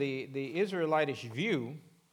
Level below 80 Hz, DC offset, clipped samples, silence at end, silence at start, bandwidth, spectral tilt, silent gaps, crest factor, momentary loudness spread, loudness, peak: -88 dBFS; under 0.1%; under 0.1%; 0.35 s; 0 s; 16 kHz; -6 dB/octave; none; 18 dB; 9 LU; -33 LUFS; -16 dBFS